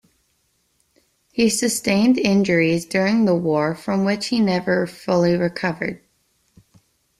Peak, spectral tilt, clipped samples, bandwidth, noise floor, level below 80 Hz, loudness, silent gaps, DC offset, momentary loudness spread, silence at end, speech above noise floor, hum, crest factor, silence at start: -4 dBFS; -5 dB/octave; under 0.1%; 14.5 kHz; -66 dBFS; -56 dBFS; -19 LUFS; none; under 0.1%; 7 LU; 1.25 s; 48 dB; none; 16 dB; 1.35 s